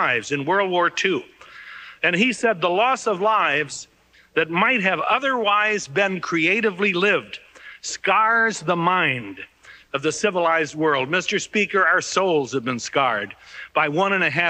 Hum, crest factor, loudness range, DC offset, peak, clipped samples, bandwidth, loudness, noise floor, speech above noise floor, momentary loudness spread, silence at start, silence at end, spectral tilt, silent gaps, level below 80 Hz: none; 16 dB; 2 LU; under 0.1%; -6 dBFS; under 0.1%; 10 kHz; -20 LUFS; -40 dBFS; 20 dB; 12 LU; 0 s; 0 s; -3.5 dB/octave; none; -66 dBFS